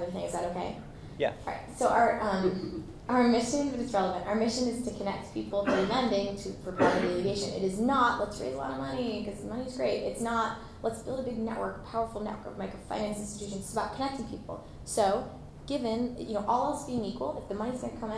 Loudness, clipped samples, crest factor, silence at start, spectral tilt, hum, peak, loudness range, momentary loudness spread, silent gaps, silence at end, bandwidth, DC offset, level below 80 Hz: -31 LUFS; under 0.1%; 18 dB; 0 s; -5 dB/octave; none; -12 dBFS; 6 LU; 12 LU; none; 0 s; 11 kHz; under 0.1%; -52 dBFS